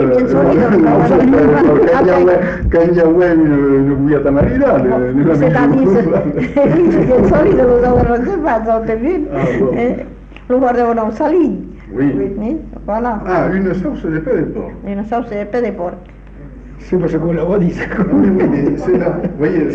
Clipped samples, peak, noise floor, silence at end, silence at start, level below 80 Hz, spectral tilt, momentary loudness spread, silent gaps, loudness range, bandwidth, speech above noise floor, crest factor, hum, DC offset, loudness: under 0.1%; -2 dBFS; -33 dBFS; 0 s; 0 s; -30 dBFS; -9.5 dB/octave; 10 LU; none; 8 LU; 7.2 kHz; 20 dB; 10 dB; none; under 0.1%; -13 LUFS